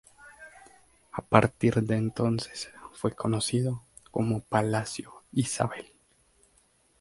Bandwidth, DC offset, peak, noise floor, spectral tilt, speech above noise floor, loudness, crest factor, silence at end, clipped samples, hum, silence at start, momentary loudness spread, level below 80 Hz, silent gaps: 11.5 kHz; under 0.1%; -2 dBFS; -66 dBFS; -5.5 dB/octave; 38 dB; -28 LUFS; 28 dB; 1.15 s; under 0.1%; none; 0.25 s; 17 LU; -58 dBFS; none